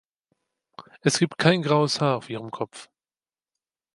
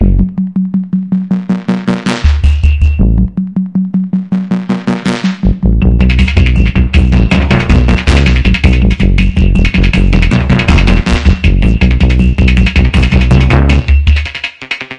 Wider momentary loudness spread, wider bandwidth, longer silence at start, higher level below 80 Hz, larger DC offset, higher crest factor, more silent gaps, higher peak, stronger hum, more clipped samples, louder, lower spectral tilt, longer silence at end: first, 14 LU vs 6 LU; first, 11.5 kHz vs 9.6 kHz; first, 0.8 s vs 0 s; second, -68 dBFS vs -12 dBFS; second, under 0.1% vs 0.6%; first, 22 dB vs 8 dB; neither; second, -4 dBFS vs 0 dBFS; neither; second, under 0.1% vs 0.2%; second, -23 LUFS vs -10 LUFS; second, -5 dB/octave vs -7 dB/octave; first, 1.1 s vs 0 s